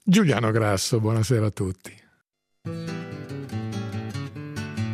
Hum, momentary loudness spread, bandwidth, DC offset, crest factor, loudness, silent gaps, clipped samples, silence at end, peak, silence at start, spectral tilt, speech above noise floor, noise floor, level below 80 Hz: none; 14 LU; 15.5 kHz; under 0.1%; 18 dB; -26 LUFS; none; under 0.1%; 0 s; -6 dBFS; 0.05 s; -6 dB/octave; 51 dB; -73 dBFS; -60 dBFS